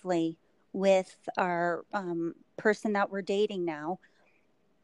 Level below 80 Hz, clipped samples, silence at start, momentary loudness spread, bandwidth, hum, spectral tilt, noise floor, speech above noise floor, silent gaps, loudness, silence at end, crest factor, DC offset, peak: -78 dBFS; under 0.1%; 0.05 s; 11 LU; 11.5 kHz; none; -6 dB/octave; -71 dBFS; 41 dB; none; -31 LUFS; 0.9 s; 18 dB; under 0.1%; -12 dBFS